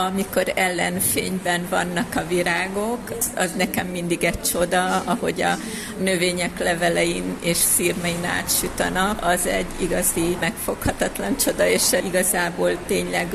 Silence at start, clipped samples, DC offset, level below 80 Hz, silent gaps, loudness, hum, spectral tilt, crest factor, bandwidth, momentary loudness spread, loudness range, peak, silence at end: 0 s; under 0.1%; under 0.1%; -42 dBFS; none; -21 LUFS; none; -3 dB/octave; 16 dB; 14.5 kHz; 6 LU; 2 LU; -6 dBFS; 0 s